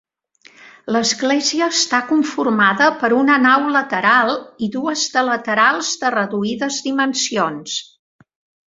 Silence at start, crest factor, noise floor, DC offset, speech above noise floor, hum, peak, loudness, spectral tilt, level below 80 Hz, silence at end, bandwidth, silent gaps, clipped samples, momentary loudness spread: 0.65 s; 18 dB; -51 dBFS; under 0.1%; 34 dB; none; 0 dBFS; -16 LUFS; -2.5 dB/octave; -64 dBFS; 0.85 s; 8 kHz; none; under 0.1%; 8 LU